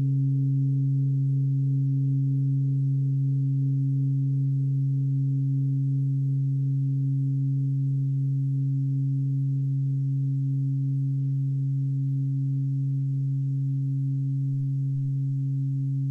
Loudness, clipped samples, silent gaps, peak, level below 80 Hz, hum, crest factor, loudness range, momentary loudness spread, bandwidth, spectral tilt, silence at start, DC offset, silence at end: -26 LUFS; under 0.1%; none; -18 dBFS; -64 dBFS; none; 6 dB; 2 LU; 3 LU; 0.5 kHz; -12.5 dB/octave; 0 s; under 0.1%; 0 s